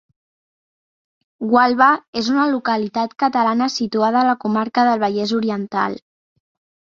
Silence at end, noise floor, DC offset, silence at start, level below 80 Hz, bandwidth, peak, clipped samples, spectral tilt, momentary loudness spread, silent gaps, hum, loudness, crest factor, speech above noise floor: 0.85 s; under -90 dBFS; under 0.1%; 1.4 s; -64 dBFS; 7.4 kHz; -2 dBFS; under 0.1%; -5 dB/octave; 7 LU; 2.08-2.13 s; none; -18 LUFS; 18 dB; over 73 dB